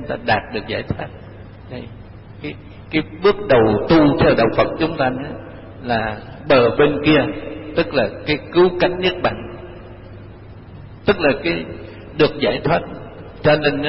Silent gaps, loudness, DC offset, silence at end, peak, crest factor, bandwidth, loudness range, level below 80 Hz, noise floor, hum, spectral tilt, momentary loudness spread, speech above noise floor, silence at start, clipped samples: none; -17 LUFS; 0.2%; 0 s; -4 dBFS; 14 dB; 5.8 kHz; 6 LU; -40 dBFS; -38 dBFS; none; -10.5 dB/octave; 22 LU; 20 dB; 0 s; under 0.1%